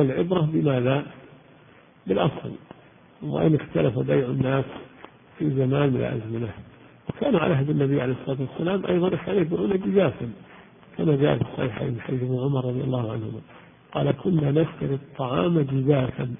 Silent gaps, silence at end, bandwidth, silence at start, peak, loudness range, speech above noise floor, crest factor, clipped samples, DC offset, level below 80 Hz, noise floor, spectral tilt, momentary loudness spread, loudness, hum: none; 0.05 s; 3.7 kHz; 0 s; -6 dBFS; 2 LU; 29 dB; 18 dB; under 0.1%; under 0.1%; -52 dBFS; -53 dBFS; -12.5 dB/octave; 14 LU; -24 LUFS; none